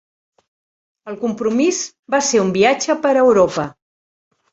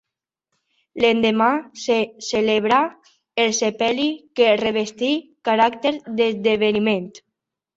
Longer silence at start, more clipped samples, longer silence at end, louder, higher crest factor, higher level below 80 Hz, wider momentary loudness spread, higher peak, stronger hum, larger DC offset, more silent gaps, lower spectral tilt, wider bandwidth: about the same, 1.05 s vs 0.95 s; neither; first, 0.8 s vs 0.6 s; first, -16 LUFS vs -20 LUFS; about the same, 16 dB vs 18 dB; first, -56 dBFS vs -62 dBFS; first, 12 LU vs 7 LU; about the same, -2 dBFS vs -2 dBFS; neither; neither; first, 1.99-2.03 s vs none; about the same, -4 dB/octave vs -3.5 dB/octave; about the same, 8.2 kHz vs 8 kHz